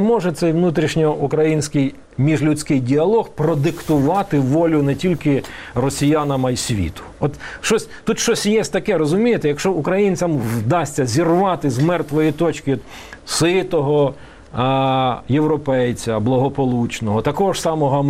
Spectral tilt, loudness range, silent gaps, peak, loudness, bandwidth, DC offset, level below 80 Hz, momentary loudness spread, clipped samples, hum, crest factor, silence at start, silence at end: -6 dB/octave; 2 LU; none; -4 dBFS; -18 LUFS; 16 kHz; 0.1%; -44 dBFS; 6 LU; under 0.1%; none; 14 dB; 0 s; 0 s